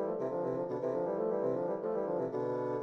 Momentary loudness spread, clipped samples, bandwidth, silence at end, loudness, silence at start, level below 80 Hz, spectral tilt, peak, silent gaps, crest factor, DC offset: 2 LU; under 0.1%; 6.4 kHz; 0 s; -35 LUFS; 0 s; -74 dBFS; -9.5 dB/octave; -22 dBFS; none; 12 dB; under 0.1%